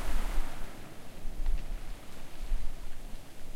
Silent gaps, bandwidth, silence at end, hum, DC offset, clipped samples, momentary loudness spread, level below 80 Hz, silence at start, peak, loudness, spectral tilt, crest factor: none; 13 kHz; 0 s; none; under 0.1%; under 0.1%; 10 LU; -34 dBFS; 0 s; -16 dBFS; -43 LUFS; -4.5 dB/octave; 14 dB